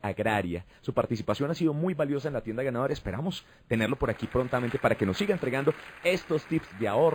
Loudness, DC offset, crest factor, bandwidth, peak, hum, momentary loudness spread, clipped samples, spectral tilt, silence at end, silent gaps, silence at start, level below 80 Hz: -29 LUFS; under 0.1%; 18 dB; 19.5 kHz; -10 dBFS; none; 6 LU; under 0.1%; -6.5 dB/octave; 0 s; none; 0.05 s; -52 dBFS